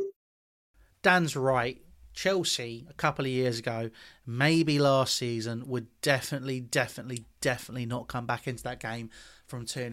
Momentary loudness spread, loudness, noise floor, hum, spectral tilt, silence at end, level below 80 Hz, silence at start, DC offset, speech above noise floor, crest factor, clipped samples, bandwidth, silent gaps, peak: 16 LU; -29 LUFS; under -90 dBFS; none; -4.5 dB/octave; 0 s; -60 dBFS; 0 s; under 0.1%; over 60 dB; 24 dB; under 0.1%; 16.5 kHz; 0.16-0.74 s; -6 dBFS